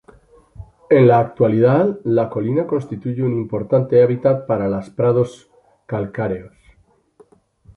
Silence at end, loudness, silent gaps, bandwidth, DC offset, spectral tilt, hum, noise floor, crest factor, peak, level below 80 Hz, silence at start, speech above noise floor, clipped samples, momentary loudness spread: 1.3 s; -18 LUFS; none; 7.8 kHz; under 0.1%; -9.5 dB/octave; none; -56 dBFS; 18 dB; 0 dBFS; -52 dBFS; 0.6 s; 39 dB; under 0.1%; 11 LU